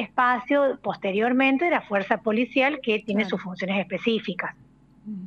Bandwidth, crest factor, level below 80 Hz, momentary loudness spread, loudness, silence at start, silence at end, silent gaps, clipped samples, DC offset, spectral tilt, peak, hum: 7 kHz; 18 dB; -64 dBFS; 9 LU; -24 LUFS; 0 s; 0 s; none; under 0.1%; under 0.1%; -6.5 dB/octave; -8 dBFS; none